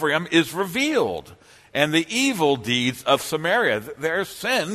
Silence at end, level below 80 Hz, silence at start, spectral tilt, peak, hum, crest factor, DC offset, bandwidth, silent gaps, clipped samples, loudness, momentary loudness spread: 0 s; -60 dBFS; 0 s; -3.5 dB/octave; -2 dBFS; none; 20 dB; under 0.1%; 13.5 kHz; none; under 0.1%; -22 LUFS; 6 LU